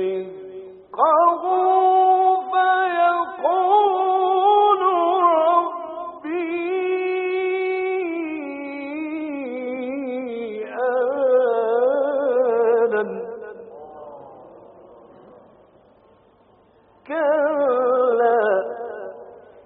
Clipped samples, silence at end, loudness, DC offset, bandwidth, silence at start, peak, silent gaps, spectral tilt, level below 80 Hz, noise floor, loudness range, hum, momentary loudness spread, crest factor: under 0.1%; 0.3 s; -20 LUFS; under 0.1%; 4.3 kHz; 0 s; -4 dBFS; none; -2 dB/octave; -72 dBFS; -55 dBFS; 9 LU; none; 17 LU; 16 dB